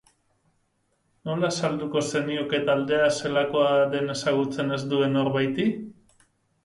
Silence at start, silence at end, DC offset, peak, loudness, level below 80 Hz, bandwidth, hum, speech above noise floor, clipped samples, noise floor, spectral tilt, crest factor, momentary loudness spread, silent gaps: 1.25 s; 0.75 s; under 0.1%; -10 dBFS; -24 LUFS; -66 dBFS; 11.5 kHz; none; 47 dB; under 0.1%; -71 dBFS; -5 dB/octave; 16 dB; 6 LU; none